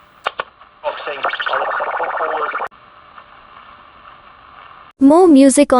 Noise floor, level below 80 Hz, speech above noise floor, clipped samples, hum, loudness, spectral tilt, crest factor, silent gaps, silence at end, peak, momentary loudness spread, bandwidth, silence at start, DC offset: -44 dBFS; -54 dBFS; 32 dB; under 0.1%; none; -15 LUFS; -3 dB/octave; 16 dB; none; 0 s; 0 dBFS; 19 LU; 12 kHz; 0.25 s; under 0.1%